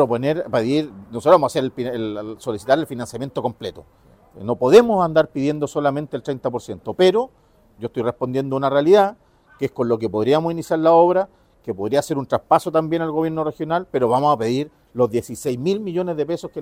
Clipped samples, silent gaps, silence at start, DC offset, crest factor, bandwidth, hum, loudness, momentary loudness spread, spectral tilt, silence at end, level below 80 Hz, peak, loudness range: under 0.1%; none; 0 s; under 0.1%; 18 dB; 16 kHz; none; -20 LUFS; 14 LU; -6.5 dB/octave; 0 s; -56 dBFS; -2 dBFS; 3 LU